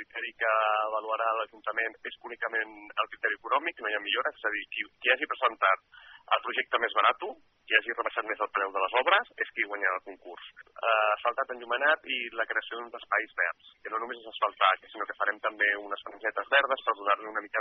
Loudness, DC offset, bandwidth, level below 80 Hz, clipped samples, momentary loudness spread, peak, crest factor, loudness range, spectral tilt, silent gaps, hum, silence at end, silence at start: -29 LUFS; under 0.1%; 4.2 kHz; -78 dBFS; under 0.1%; 11 LU; -6 dBFS; 24 dB; 3 LU; 3.5 dB/octave; none; none; 0 s; 0 s